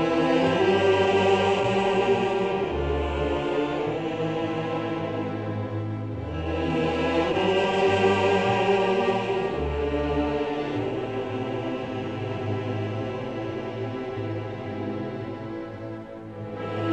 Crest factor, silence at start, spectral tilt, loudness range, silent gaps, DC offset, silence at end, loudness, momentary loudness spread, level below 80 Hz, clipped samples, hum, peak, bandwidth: 16 dB; 0 s; -6.5 dB/octave; 8 LU; none; 0.1%; 0 s; -26 LUFS; 11 LU; -42 dBFS; under 0.1%; none; -10 dBFS; 8.8 kHz